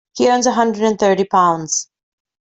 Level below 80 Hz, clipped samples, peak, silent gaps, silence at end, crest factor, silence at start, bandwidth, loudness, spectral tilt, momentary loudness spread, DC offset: -58 dBFS; under 0.1%; -2 dBFS; none; 0.6 s; 14 dB; 0.15 s; 8.4 kHz; -15 LUFS; -3.5 dB/octave; 6 LU; under 0.1%